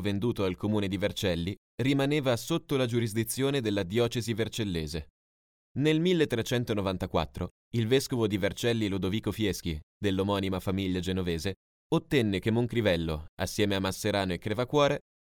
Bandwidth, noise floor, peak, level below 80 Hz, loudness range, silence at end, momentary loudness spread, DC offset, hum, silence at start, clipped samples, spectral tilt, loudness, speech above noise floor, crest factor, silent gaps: 17.5 kHz; under -90 dBFS; -10 dBFS; -50 dBFS; 2 LU; 0.3 s; 8 LU; under 0.1%; none; 0 s; under 0.1%; -5.5 dB/octave; -29 LUFS; over 61 dB; 18 dB; 1.57-1.78 s, 5.10-5.75 s, 7.51-7.71 s, 9.83-10.01 s, 11.56-11.90 s, 13.29-13.37 s